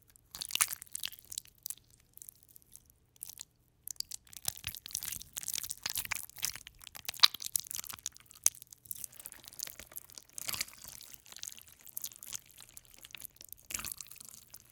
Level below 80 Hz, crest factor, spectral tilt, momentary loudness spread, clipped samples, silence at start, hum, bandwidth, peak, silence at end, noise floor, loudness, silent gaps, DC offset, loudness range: -68 dBFS; 40 dB; 1.5 dB/octave; 20 LU; under 0.1%; 0.35 s; none; 19 kHz; -2 dBFS; 0.15 s; -61 dBFS; -36 LUFS; none; under 0.1%; 12 LU